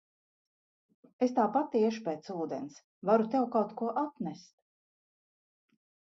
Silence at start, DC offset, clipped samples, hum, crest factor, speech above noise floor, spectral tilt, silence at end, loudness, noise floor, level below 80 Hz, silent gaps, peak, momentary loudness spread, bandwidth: 1.2 s; under 0.1%; under 0.1%; none; 20 dB; over 59 dB; -7 dB/octave; 1.75 s; -32 LUFS; under -90 dBFS; -84 dBFS; 2.84-3.02 s; -14 dBFS; 13 LU; 7.6 kHz